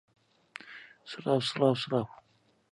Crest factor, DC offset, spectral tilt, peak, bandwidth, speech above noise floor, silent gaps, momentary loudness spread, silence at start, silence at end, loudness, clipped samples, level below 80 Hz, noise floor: 22 dB; under 0.1%; -6 dB/octave; -12 dBFS; 11.5 kHz; 22 dB; none; 21 LU; 0.65 s; 0.6 s; -30 LUFS; under 0.1%; -72 dBFS; -52 dBFS